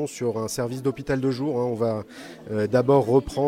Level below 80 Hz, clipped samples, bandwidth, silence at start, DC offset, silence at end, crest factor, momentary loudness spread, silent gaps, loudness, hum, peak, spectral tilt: -50 dBFS; under 0.1%; 16 kHz; 0 s; under 0.1%; 0 s; 16 dB; 12 LU; none; -24 LUFS; none; -6 dBFS; -6.5 dB/octave